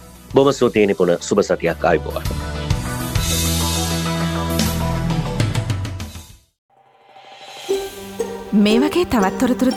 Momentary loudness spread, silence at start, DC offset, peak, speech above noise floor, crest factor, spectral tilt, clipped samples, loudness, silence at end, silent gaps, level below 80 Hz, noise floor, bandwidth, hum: 12 LU; 0 s; under 0.1%; -2 dBFS; 32 dB; 18 dB; -5 dB/octave; under 0.1%; -19 LUFS; 0 s; 6.58-6.69 s; -34 dBFS; -48 dBFS; 19 kHz; none